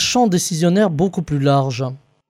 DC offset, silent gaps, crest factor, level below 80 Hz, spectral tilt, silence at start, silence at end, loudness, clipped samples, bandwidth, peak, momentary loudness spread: under 0.1%; none; 12 dB; -48 dBFS; -5 dB/octave; 0 s; 0.35 s; -17 LUFS; under 0.1%; 15.5 kHz; -4 dBFS; 8 LU